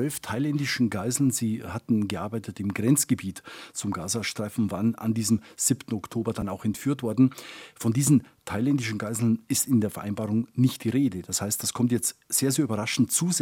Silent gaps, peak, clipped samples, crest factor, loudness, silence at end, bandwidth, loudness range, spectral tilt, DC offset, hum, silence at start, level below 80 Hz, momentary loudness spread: none; -8 dBFS; under 0.1%; 18 dB; -26 LUFS; 0 s; 17.5 kHz; 2 LU; -4.5 dB/octave; under 0.1%; none; 0 s; -64 dBFS; 9 LU